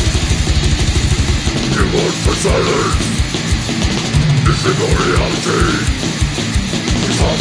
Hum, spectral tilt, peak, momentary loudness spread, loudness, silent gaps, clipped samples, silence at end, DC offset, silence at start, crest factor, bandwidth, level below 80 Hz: none; -4.5 dB/octave; 0 dBFS; 3 LU; -15 LUFS; none; under 0.1%; 0 s; under 0.1%; 0 s; 14 dB; 10.5 kHz; -20 dBFS